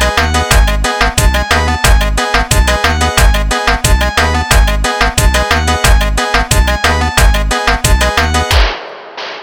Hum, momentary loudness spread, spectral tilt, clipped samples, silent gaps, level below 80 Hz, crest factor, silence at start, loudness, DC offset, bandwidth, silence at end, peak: none; 2 LU; -3.5 dB/octave; 0.2%; none; -14 dBFS; 10 dB; 0 s; -11 LUFS; 0.2%; over 20 kHz; 0 s; 0 dBFS